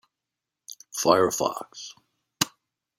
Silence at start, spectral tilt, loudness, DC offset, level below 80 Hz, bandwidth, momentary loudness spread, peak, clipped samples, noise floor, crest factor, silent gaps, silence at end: 0.7 s; -3 dB/octave; -25 LUFS; under 0.1%; -68 dBFS; 16.5 kHz; 22 LU; -4 dBFS; under 0.1%; -87 dBFS; 26 dB; none; 0.5 s